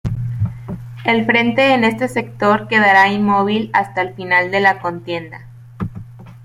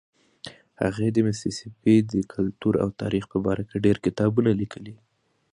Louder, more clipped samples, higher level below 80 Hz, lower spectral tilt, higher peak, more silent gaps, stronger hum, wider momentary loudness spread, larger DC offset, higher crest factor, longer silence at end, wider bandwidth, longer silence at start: first, -15 LUFS vs -24 LUFS; neither; first, -44 dBFS vs -52 dBFS; about the same, -6 dB/octave vs -7 dB/octave; first, 0 dBFS vs -6 dBFS; neither; neither; second, 17 LU vs 21 LU; neither; about the same, 16 dB vs 18 dB; second, 0 s vs 0.6 s; first, 15.5 kHz vs 11 kHz; second, 0.05 s vs 0.45 s